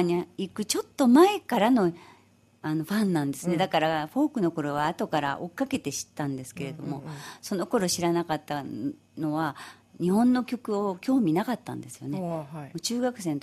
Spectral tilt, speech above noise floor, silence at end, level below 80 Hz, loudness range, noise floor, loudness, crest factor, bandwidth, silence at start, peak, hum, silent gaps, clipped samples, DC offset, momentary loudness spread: -5 dB/octave; 33 dB; 0 s; -66 dBFS; 6 LU; -60 dBFS; -27 LUFS; 20 dB; 15.5 kHz; 0 s; -8 dBFS; none; none; under 0.1%; under 0.1%; 13 LU